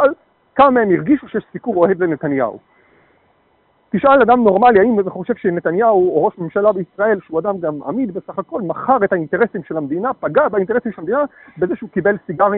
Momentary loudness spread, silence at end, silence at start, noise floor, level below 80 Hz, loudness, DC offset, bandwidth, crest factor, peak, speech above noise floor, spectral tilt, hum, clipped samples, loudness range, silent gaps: 12 LU; 0 s; 0 s; -58 dBFS; -54 dBFS; -16 LUFS; under 0.1%; 4.2 kHz; 14 dB; -2 dBFS; 42 dB; -6 dB/octave; none; under 0.1%; 5 LU; none